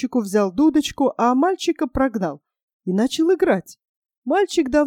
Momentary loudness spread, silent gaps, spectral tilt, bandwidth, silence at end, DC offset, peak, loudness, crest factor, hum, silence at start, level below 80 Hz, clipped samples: 8 LU; 2.63-2.80 s, 3.89-4.02 s, 4.17-4.22 s; -5.5 dB/octave; 16 kHz; 0 s; under 0.1%; -6 dBFS; -20 LUFS; 14 dB; none; 0 s; -46 dBFS; under 0.1%